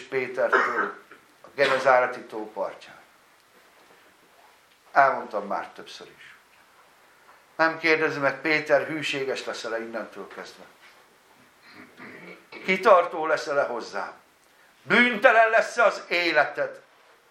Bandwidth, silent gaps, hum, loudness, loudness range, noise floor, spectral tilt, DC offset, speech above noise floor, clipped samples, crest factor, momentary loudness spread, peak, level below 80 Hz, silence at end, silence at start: 14.5 kHz; none; none; -23 LUFS; 8 LU; -58 dBFS; -4 dB/octave; under 0.1%; 34 dB; under 0.1%; 26 dB; 23 LU; 0 dBFS; -80 dBFS; 0.5 s; 0 s